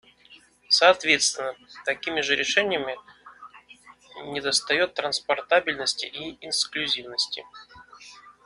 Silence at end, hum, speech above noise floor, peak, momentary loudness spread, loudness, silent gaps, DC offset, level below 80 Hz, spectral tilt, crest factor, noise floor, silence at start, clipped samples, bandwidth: 0.15 s; none; 29 dB; -2 dBFS; 16 LU; -23 LUFS; none; under 0.1%; -66 dBFS; -0.5 dB/octave; 24 dB; -54 dBFS; 0.3 s; under 0.1%; 11.5 kHz